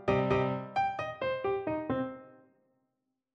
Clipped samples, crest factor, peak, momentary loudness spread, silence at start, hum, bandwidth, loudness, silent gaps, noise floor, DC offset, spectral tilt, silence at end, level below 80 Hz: under 0.1%; 20 dB; -12 dBFS; 7 LU; 0 s; none; 7.2 kHz; -32 LUFS; none; -83 dBFS; under 0.1%; -8 dB/octave; 1 s; -58 dBFS